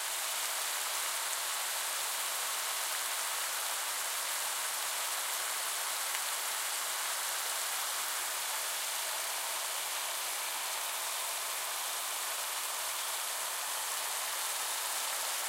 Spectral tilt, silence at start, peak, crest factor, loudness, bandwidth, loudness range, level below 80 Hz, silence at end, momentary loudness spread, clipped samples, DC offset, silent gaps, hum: 4 dB/octave; 0 s; -16 dBFS; 20 dB; -33 LUFS; 16 kHz; 1 LU; under -90 dBFS; 0 s; 1 LU; under 0.1%; under 0.1%; none; none